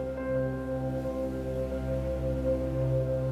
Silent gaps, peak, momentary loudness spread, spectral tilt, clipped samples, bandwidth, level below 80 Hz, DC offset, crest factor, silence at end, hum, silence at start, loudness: none; -18 dBFS; 4 LU; -9 dB/octave; under 0.1%; 13 kHz; -40 dBFS; under 0.1%; 12 dB; 0 s; none; 0 s; -31 LUFS